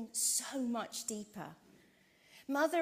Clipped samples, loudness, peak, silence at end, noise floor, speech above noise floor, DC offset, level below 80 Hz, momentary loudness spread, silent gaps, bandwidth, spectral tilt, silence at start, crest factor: under 0.1%; -36 LUFS; -20 dBFS; 0 s; -67 dBFS; 30 dB; under 0.1%; -82 dBFS; 18 LU; none; 16 kHz; -2 dB/octave; 0 s; 18 dB